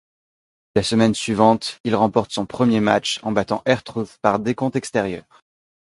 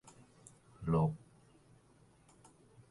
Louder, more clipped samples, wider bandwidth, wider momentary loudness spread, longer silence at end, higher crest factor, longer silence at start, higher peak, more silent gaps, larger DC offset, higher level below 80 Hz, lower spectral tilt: first, -20 LUFS vs -35 LUFS; neither; about the same, 11.5 kHz vs 11.5 kHz; second, 7 LU vs 27 LU; second, 0.65 s vs 1.75 s; about the same, 20 dB vs 20 dB; about the same, 0.75 s vs 0.8 s; first, 0 dBFS vs -20 dBFS; first, 1.80-1.84 s vs none; neither; first, -52 dBFS vs -60 dBFS; second, -5 dB/octave vs -9 dB/octave